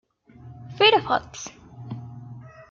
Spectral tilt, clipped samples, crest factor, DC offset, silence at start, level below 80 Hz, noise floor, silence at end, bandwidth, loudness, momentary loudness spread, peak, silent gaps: -3.5 dB/octave; under 0.1%; 22 dB; under 0.1%; 0.45 s; -60 dBFS; -47 dBFS; 0.3 s; 7.6 kHz; -20 LUFS; 26 LU; -4 dBFS; none